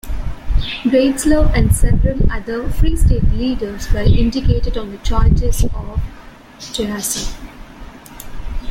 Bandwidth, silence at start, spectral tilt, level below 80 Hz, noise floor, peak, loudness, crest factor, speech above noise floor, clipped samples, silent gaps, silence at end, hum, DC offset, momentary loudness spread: 16 kHz; 0.05 s; -5.5 dB/octave; -18 dBFS; -35 dBFS; 0 dBFS; -18 LUFS; 14 dB; 22 dB; under 0.1%; none; 0 s; none; under 0.1%; 20 LU